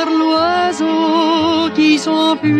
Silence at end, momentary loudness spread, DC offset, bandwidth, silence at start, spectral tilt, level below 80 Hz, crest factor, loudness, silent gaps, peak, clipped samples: 0 s; 3 LU; under 0.1%; 9.4 kHz; 0 s; -4.5 dB/octave; -56 dBFS; 12 dB; -14 LUFS; none; -2 dBFS; under 0.1%